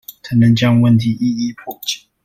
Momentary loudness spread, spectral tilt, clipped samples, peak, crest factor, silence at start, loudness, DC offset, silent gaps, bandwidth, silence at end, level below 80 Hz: 12 LU; -6.5 dB/octave; under 0.1%; -2 dBFS; 14 dB; 0.1 s; -15 LUFS; under 0.1%; none; 16 kHz; 0.3 s; -48 dBFS